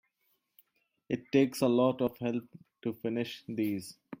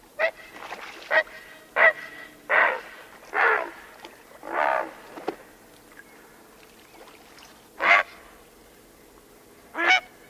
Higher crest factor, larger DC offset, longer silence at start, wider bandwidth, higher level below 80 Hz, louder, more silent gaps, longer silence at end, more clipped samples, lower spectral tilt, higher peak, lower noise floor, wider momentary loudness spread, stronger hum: about the same, 20 dB vs 24 dB; neither; first, 1.1 s vs 0.2 s; about the same, 16.5 kHz vs 16 kHz; second, -72 dBFS vs -66 dBFS; second, -32 LUFS vs -23 LUFS; neither; second, 0.05 s vs 0.25 s; neither; first, -6.5 dB/octave vs -1.5 dB/octave; second, -12 dBFS vs -4 dBFS; first, -77 dBFS vs -52 dBFS; second, 13 LU vs 24 LU; neither